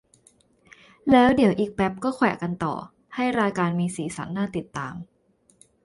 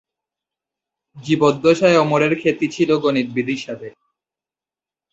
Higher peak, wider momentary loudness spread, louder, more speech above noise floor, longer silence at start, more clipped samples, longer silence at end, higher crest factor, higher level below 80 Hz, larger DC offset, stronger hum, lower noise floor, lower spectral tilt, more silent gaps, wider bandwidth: about the same, -4 dBFS vs -2 dBFS; about the same, 15 LU vs 17 LU; second, -24 LUFS vs -17 LUFS; second, 37 dB vs over 73 dB; about the same, 1.05 s vs 1.15 s; neither; second, 0.8 s vs 1.25 s; about the same, 22 dB vs 18 dB; first, -54 dBFS vs -60 dBFS; neither; neither; second, -60 dBFS vs under -90 dBFS; about the same, -6.5 dB/octave vs -6 dB/octave; neither; first, 11.5 kHz vs 8 kHz